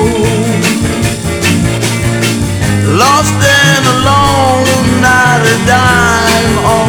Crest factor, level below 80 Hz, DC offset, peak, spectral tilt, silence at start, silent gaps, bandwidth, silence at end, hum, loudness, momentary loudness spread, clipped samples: 8 dB; -28 dBFS; under 0.1%; 0 dBFS; -4 dB/octave; 0 s; none; over 20 kHz; 0 s; none; -9 LUFS; 5 LU; 0.6%